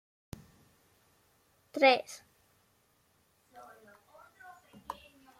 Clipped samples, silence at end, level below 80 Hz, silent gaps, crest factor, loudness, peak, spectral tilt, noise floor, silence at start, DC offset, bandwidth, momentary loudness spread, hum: under 0.1%; 0.45 s; -70 dBFS; none; 26 dB; -28 LUFS; -10 dBFS; -3 dB/octave; -71 dBFS; 1.75 s; under 0.1%; 15.5 kHz; 29 LU; none